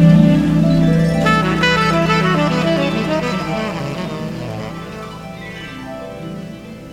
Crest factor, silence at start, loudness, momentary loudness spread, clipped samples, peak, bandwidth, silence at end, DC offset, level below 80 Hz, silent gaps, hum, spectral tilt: 16 dB; 0 s; -15 LUFS; 16 LU; under 0.1%; 0 dBFS; 11.5 kHz; 0 s; under 0.1%; -36 dBFS; none; none; -6.5 dB/octave